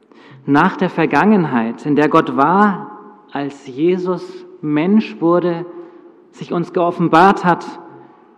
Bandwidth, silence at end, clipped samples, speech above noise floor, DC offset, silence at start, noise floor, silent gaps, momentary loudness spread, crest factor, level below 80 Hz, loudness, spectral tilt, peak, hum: 9.6 kHz; 0.4 s; under 0.1%; 27 dB; under 0.1%; 0.45 s; -41 dBFS; none; 18 LU; 16 dB; -58 dBFS; -15 LUFS; -7.5 dB/octave; 0 dBFS; none